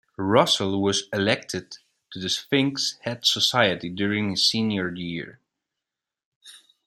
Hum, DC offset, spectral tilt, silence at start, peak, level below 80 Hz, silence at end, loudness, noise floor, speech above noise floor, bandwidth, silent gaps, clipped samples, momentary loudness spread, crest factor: none; under 0.1%; -3.5 dB/octave; 0.2 s; -2 dBFS; -66 dBFS; 0.3 s; -23 LUFS; -87 dBFS; 63 dB; 15.5 kHz; 6.25-6.41 s; under 0.1%; 14 LU; 22 dB